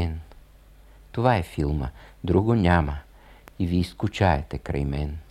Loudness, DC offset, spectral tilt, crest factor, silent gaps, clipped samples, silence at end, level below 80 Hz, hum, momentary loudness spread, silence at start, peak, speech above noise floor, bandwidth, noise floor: -25 LUFS; under 0.1%; -7.5 dB/octave; 20 dB; none; under 0.1%; 0.1 s; -36 dBFS; none; 15 LU; 0 s; -4 dBFS; 27 dB; 13.5 kHz; -51 dBFS